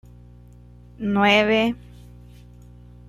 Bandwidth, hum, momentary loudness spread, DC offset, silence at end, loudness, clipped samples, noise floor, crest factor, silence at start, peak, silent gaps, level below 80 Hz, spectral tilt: 13.5 kHz; 60 Hz at -40 dBFS; 14 LU; under 0.1%; 1.3 s; -19 LUFS; under 0.1%; -46 dBFS; 20 dB; 1 s; -4 dBFS; none; -48 dBFS; -5.5 dB/octave